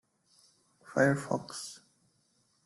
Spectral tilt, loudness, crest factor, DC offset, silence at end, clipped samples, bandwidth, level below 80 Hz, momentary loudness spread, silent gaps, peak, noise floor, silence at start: -5.5 dB/octave; -31 LUFS; 22 dB; under 0.1%; 0.9 s; under 0.1%; 12.5 kHz; -72 dBFS; 17 LU; none; -12 dBFS; -73 dBFS; 0.85 s